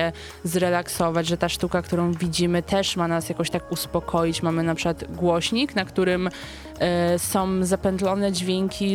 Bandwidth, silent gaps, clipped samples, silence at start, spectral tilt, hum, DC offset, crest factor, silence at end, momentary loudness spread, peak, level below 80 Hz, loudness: 17 kHz; none; under 0.1%; 0 s; -5 dB/octave; none; under 0.1%; 16 dB; 0 s; 5 LU; -8 dBFS; -46 dBFS; -24 LUFS